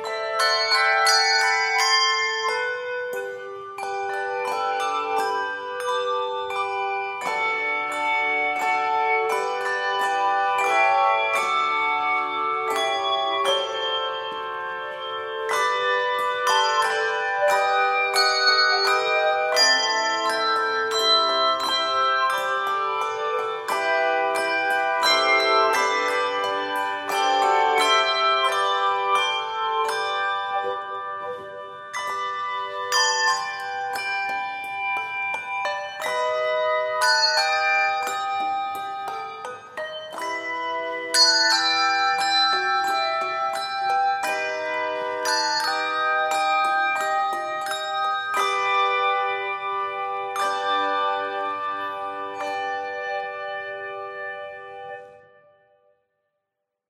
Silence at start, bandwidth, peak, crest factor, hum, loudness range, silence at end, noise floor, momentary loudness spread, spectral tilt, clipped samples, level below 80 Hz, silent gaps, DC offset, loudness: 0 s; 16 kHz; -4 dBFS; 20 dB; none; 7 LU; 1.7 s; -82 dBFS; 12 LU; 0.5 dB/octave; under 0.1%; -76 dBFS; none; under 0.1%; -22 LUFS